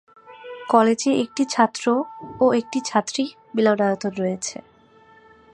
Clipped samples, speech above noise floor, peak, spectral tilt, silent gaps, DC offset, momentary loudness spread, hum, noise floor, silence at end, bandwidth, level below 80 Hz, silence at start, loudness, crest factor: under 0.1%; 32 dB; -2 dBFS; -4.5 dB/octave; none; under 0.1%; 14 LU; none; -52 dBFS; 1 s; 11 kHz; -66 dBFS; 0.3 s; -21 LUFS; 20 dB